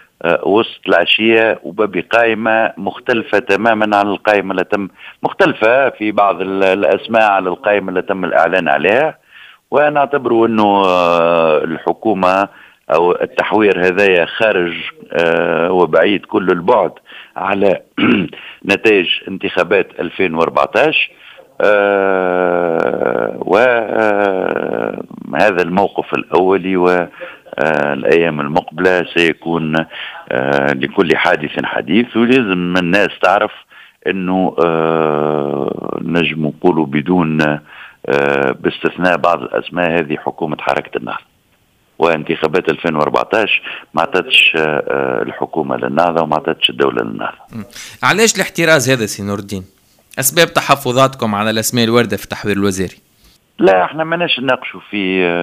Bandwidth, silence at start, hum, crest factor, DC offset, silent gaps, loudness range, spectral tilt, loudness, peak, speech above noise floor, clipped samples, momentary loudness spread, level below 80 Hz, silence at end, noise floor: 16 kHz; 0.25 s; none; 14 dB; under 0.1%; none; 3 LU; -4.5 dB/octave; -14 LUFS; 0 dBFS; 42 dB; under 0.1%; 9 LU; -54 dBFS; 0 s; -56 dBFS